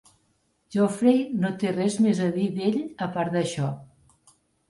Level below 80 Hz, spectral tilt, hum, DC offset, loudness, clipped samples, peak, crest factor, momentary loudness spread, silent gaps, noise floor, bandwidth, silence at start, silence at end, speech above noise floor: -66 dBFS; -6.5 dB/octave; none; under 0.1%; -25 LUFS; under 0.1%; -8 dBFS; 18 dB; 9 LU; none; -69 dBFS; 11.5 kHz; 0.7 s; 0.85 s; 45 dB